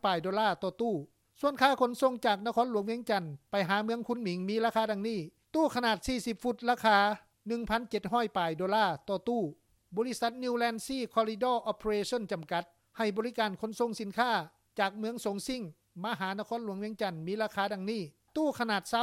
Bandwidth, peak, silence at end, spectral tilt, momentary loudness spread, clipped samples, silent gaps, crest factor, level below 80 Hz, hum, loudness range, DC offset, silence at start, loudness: 16.5 kHz; -10 dBFS; 0 s; -4.5 dB/octave; 8 LU; under 0.1%; none; 22 dB; -62 dBFS; none; 4 LU; under 0.1%; 0.05 s; -32 LUFS